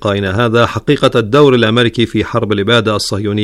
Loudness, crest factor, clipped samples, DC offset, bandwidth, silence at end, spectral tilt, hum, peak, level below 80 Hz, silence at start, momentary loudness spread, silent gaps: -12 LUFS; 12 dB; under 0.1%; under 0.1%; 13.5 kHz; 0 s; -5.5 dB/octave; none; 0 dBFS; -40 dBFS; 0 s; 6 LU; none